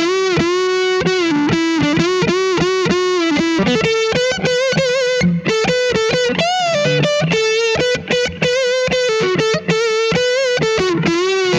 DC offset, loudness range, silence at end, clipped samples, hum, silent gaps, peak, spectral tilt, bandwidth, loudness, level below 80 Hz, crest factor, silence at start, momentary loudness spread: under 0.1%; 0 LU; 0 s; under 0.1%; none; none; -2 dBFS; -4.5 dB/octave; 11 kHz; -15 LUFS; -44 dBFS; 14 dB; 0 s; 1 LU